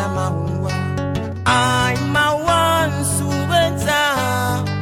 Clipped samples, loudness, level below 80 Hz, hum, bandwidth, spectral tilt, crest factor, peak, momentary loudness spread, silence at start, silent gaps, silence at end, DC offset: under 0.1%; -18 LUFS; -40 dBFS; none; 18.5 kHz; -4.5 dB/octave; 14 dB; -4 dBFS; 7 LU; 0 s; none; 0 s; under 0.1%